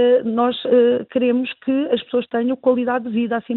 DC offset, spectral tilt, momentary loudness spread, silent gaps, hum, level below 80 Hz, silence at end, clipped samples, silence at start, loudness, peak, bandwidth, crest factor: under 0.1%; -9.5 dB/octave; 6 LU; none; none; -66 dBFS; 0 s; under 0.1%; 0 s; -19 LUFS; -4 dBFS; 4.1 kHz; 14 dB